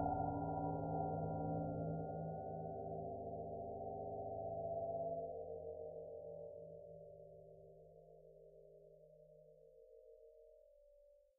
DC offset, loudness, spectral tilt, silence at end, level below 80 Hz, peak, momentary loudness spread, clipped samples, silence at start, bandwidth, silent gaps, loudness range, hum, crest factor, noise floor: under 0.1%; -46 LUFS; -2 dB/octave; 0.25 s; -66 dBFS; -28 dBFS; 22 LU; under 0.1%; 0 s; 1.6 kHz; none; 19 LU; none; 18 dB; -69 dBFS